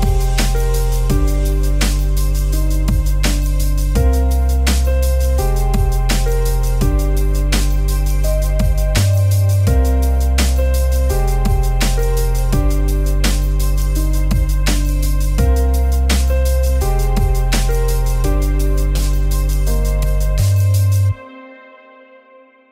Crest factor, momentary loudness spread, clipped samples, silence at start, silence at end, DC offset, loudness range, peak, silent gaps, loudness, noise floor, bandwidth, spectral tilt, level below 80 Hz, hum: 14 dB; 4 LU; under 0.1%; 0 s; 1.2 s; under 0.1%; 2 LU; 0 dBFS; none; -17 LUFS; -46 dBFS; 16.5 kHz; -5.5 dB/octave; -14 dBFS; none